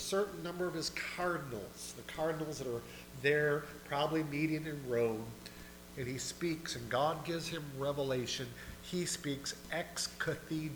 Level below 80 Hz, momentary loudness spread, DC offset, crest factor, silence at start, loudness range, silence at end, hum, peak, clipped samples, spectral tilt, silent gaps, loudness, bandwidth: -60 dBFS; 10 LU; under 0.1%; 20 dB; 0 s; 2 LU; 0 s; 60 Hz at -60 dBFS; -18 dBFS; under 0.1%; -4 dB/octave; none; -37 LUFS; over 20 kHz